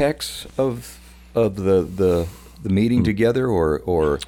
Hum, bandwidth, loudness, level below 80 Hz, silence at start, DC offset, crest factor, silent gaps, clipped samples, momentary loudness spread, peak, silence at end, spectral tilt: none; 18 kHz; -20 LUFS; -40 dBFS; 0 s; under 0.1%; 14 dB; none; under 0.1%; 11 LU; -6 dBFS; 0 s; -6.5 dB/octave